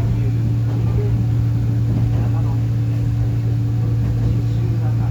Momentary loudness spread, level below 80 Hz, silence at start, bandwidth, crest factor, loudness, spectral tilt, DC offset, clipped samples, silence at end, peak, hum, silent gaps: 1 LU; -30 dBFS; 0 s; 5.8 kHz; 10 dB; -19 LUFS; -9 dB/octave; under 0.1%; under 0.1%; 0 s; -8 dBFS; none; none